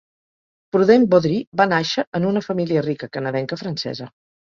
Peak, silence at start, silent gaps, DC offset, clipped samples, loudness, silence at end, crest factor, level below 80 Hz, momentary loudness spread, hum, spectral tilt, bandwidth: -2 dBFS; 0.75 s; 1.47-1.52 s, 2.07-2.12 s; under 0.1%; under 0.1%; -19 LUFS; 0.3 s; 18 dB; -60 dBFS; 12 LU; none; -6.5 dB/octave; 7.4 kHz